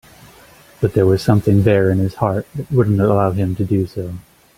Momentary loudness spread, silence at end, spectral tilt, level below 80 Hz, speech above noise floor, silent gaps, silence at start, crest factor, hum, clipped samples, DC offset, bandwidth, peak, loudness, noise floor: 10 LU; 0.35 s; -8.5 dB/octave; -44 dBFS; 30 dB; none; 0.8 s; 16 dB; none; under 0.1%; under 0.1%; 15.5 kHz; -2 dBFS; -16 LUFS; -45 dBFS